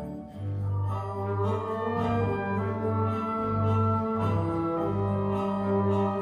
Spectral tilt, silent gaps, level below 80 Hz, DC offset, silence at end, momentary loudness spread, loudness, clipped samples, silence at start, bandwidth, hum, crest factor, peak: -9.5 dB/octave; none; -52 dBFS; under 0.1%; 0 s; 6 LU; -28 LUFS; under 0.1%; 0 s; 5 kHz; none; 12 dB; -16 dBFS